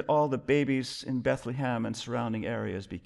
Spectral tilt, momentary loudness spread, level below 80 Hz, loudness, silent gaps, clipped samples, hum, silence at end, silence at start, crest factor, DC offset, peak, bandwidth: -6 dB/octave; 7 LU; -60 dBFS; -30 LUFS; none; under 0.1%; none; 0.05 s; 0 s; 16 dB; under 0.1%; -14 dBFS; 12 kHz